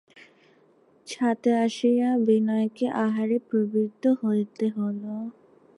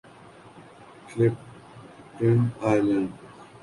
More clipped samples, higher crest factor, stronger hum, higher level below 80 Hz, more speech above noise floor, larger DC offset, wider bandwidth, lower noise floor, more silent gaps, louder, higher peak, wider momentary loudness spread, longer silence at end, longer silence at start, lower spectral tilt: neither; about the same, 14 dB vs 18 dB; neither; second, -78 dBFS vs -60 dBFS; first, 36 dB vs 26 dB; neither; about the same, 11 kHz vs 11.5 kHz; first, -60 dBFS vs -49 dBFS; neither; about the same, -25 LUFS vs -24 LUFS; about the same, -10 dBFS vs -8 dBFS; second, 10 LU vs 24 LU; first, 0.45 s vs 0.2 s; first, 1.05 s vs 0.55 s; second, -6.5 dB/octave vs -8.5 dB/octave